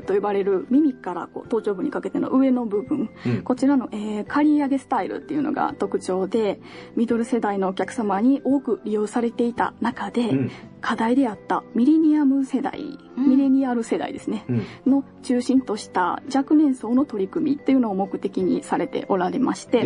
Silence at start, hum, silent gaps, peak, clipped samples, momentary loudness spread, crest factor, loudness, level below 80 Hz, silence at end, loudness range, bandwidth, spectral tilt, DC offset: 0 s; none; none; -6 dBFS; under 0.1%; 8 LU; 16 dB; -22 LUFS; -62 dBFS; 0 s; 2 LU; 10.5 kHz; -6.5 dB/octave; under 0.1%